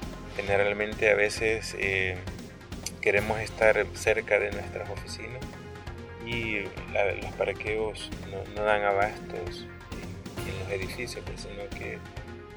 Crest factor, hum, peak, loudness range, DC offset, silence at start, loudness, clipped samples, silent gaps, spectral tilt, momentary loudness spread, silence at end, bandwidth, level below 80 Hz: 22 dB; none; -8 dBFS; 6 LU; under 0.1%; 0 s; -29 LUFS; under 0.1%; none; -4.5 dB/octave; 16 LU; 0 s; over 20 kHz; -46 dBFS